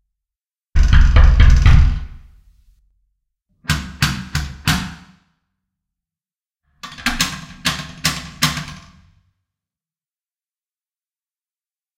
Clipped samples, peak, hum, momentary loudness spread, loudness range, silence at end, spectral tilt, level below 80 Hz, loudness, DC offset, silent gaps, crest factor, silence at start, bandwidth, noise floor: under 0.1%; 0 dBFS; none; 17 LU; 9 LU; 3.25 s; -4 dB/octave; -20 dBFS; -17 LUFS; under 0.1%; none; 18 dB; 0.75 s; 16 kHz; under -90 dBFS